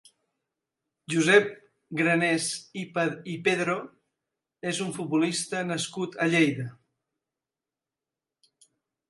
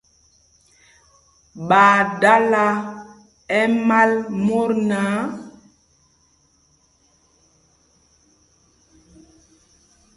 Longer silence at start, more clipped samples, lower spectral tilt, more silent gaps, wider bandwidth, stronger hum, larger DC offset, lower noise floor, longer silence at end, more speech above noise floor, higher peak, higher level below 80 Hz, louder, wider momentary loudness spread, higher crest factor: second, 1.1 s vs 1.55 s; neither; second, -4.5 dB/octave vs -6 dB/octave; neither; about the same, 11.5 kHz vs 11.5 kHz; neither; neither; first, -90 dBFS vs -60 dBFS; second, 2.35 s vs 4.65 s; first, 64 dB vs 43 dB; second, -6 dBFS vs 0 dBFS; second, -76 dBFS vs -62 dBFS; second, -26 LUFS vs -17 LUFS; about the same, 14 LU vs 16 LU; about the same, 24 dB vs 22 dB